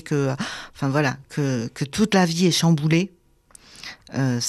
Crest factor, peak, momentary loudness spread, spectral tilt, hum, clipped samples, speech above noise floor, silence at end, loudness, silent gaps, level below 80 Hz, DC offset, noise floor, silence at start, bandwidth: 16 dB; -8 dBFS; 13 LU; -5 dB/octave; none; under 0.1%; 31 dB; 0 s; -22 LUFS; none; -56 dBFS; under 0.1%; -53 dBFS; 0.05 s; 13.5 kHz